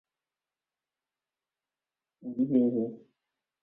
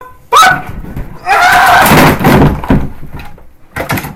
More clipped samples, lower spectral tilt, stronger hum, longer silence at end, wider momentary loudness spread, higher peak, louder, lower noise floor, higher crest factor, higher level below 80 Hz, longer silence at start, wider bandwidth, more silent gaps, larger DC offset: second, under 0.1% vs 0.4%; first, -12.5 dB/octave vs -4.5 dB/octave; neither; first, 0.65 s vs 0 s; second, 14 LU vs 20 LU; second, -14 dBFS vs 0 dBFS; second, -29 LUFS vs -7 LUFS; first, under -90 dBFS vs -30 dBFS; first, 20 dB vs 10 dB; second, -78 dBFS vs -24 dBFS; first, 2.25 s vs 0 s; second, 3.2 kHz vs 17.5 kHz; neither; neither